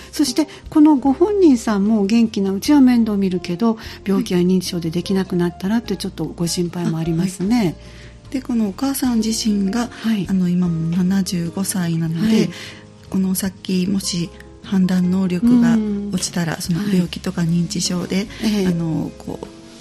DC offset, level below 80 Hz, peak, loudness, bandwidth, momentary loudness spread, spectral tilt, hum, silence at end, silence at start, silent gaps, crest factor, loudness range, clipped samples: under 0.1%; -44 dBFS; -4 dBFS; -19 LUFS; 14 kHz; 10 LU; -6 dB/octave; none; 0 s; 0 s; none; 16 dB; 5 LU; under 0.1%